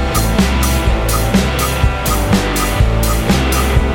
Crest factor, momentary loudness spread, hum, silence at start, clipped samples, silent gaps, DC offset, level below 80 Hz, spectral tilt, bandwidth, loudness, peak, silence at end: 12 dB; 2 LU; none; 0 s; under 0.1%; none; under 0.1%; -16 dBFS; -5 dB/octave; 17 kHz; -14 LUFS; 0 dBFS; 0 s